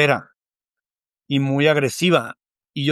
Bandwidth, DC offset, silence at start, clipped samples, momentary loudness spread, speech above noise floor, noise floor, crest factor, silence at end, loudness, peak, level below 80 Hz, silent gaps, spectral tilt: 14.5 kHz; under 0.1%; 0 s; under 0.1%; 11 LU; 72 dB; -90 dBFS; 18 dB; 0 s; -19 LUFS; -2 dBFS; -68 dBFS; none; -5.5 dB/octave